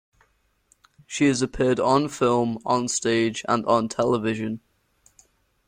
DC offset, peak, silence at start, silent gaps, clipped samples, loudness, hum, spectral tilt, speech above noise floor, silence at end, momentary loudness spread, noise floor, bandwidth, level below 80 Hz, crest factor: under 0.1%; -6 dBFS; 1.1 s; none; under 0.1%; -23 LUFS; none; -4.5 dB/octave; 43 dB; 1.1 s; 7 LU; -66 dBFS; 16 kHz; -54 dBFS; 18 dB